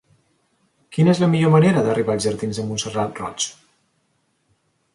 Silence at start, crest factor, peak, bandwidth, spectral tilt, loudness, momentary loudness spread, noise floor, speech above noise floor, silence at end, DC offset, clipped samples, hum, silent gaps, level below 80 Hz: 0.9 s; 16 dB; -4 dBFS; 11.5 kHz; -6 dB/octave; -19 LUFS; 11 LU; -67 dBFS; 49 dB; 1.45 s; under 0.1%; under 0.1%; none; none; -56 dBFS